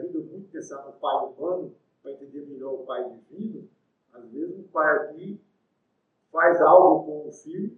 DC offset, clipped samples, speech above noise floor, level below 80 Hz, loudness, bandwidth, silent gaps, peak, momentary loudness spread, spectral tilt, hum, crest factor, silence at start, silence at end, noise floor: under 0.1%; under 0.1%; 50 dB; -84 dBFS; -22 LUFS; 6.8 kHz; none; -2 dBFS; 25 LU; -6.5 dB/octave; none; 22 dB; 0 s; 0.05 s; -74 dBFS